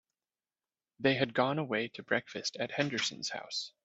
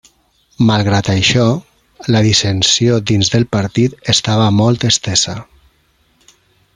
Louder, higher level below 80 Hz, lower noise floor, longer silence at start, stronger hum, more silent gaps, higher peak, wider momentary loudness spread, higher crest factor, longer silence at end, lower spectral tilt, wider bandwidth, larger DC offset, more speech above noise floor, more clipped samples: second, -33 LUFS vs -13 LUFS; second, -74 dBFS vs -44 dBFS; first, under -90 dBFS vs -57 dBFS; first, 1 s vs 0.6 s; neither; neither; second, -12 dBFS vs 0 dBFS; first, 8 LU vs 5 LU; first, 22 dB vs 14 dB; second, 0.15 s vs 1.35 s; about the same, -4 dB/octave vs -4.5 dB/octave; second, 8.2 kHz vs 11 kHz; neither; first, over 56 dB vs 44 dB; neither